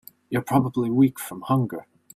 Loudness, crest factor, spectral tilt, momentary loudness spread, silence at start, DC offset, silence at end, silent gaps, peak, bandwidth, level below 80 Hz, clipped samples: -23 LUFS; 18 dB; -7.5 dB/octave; 11 LU; 0.3 s; under 0.1%; 0.35 s; none; -6 dBFS; 15.5 kHz; -58 dBFS; under 0.1%